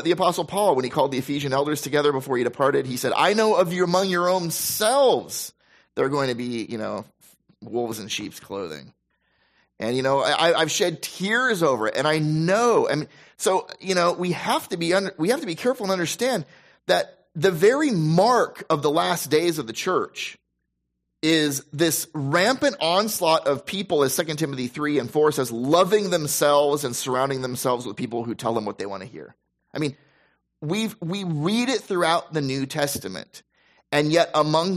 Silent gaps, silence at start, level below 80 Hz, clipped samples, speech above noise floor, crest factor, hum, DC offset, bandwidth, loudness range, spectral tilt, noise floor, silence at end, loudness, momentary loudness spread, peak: none; 0 s; -66 dBFS; under 0.1%; 55 dB; 18 dB; none; under 0.1%; 15.5 kHz; 7 LU; -4 dB/octave; -77 dBFS; 0 s; -22 LUFS; 11 LU; -6 dBFS